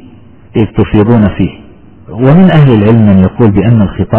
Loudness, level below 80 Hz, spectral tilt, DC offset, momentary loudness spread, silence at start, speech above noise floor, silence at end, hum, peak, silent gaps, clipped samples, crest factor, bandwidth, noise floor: -7 LUFS; -26 dBFS; -12.5 dB/octave; under 0.1%; 10 LU; 0.55 s; 29 dB; 0 s; none; 0 dBFS; none; 4%; 8 dB; 4 kHz; -35 dBFS